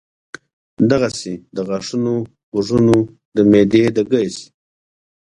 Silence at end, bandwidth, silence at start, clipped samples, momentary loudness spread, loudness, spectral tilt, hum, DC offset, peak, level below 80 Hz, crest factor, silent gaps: 0.95 s; 11 kHz; 0.8 s; under 0.1%; 13 LU; -17 LUFS; -6.5 dB/octave; none; under 0.1%; 0 dBFS; -50 dBFS; 18 dB; 2.43-2.52 s, 3.25-3.32 s